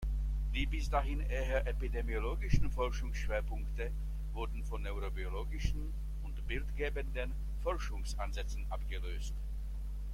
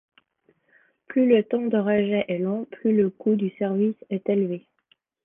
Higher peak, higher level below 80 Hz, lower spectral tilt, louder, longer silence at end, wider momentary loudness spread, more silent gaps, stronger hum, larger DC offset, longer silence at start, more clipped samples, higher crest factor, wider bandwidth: second, -14 dBFS vs -6 dBFS; first, -36 dBFS vs -68 dBFS; second, -6 dB/octave vs -11 dB/octave; second, -39 LUFS vs -24 LUFS; second, 0 s vs 0.65 s; about the same, 7 LU vs 8 LU; neither; neither; neither; second, 0 s vs 1.1 s; neither; about the same, 22 dB vs 18 dB; first, 11.5 kHz vs 3.7 kHz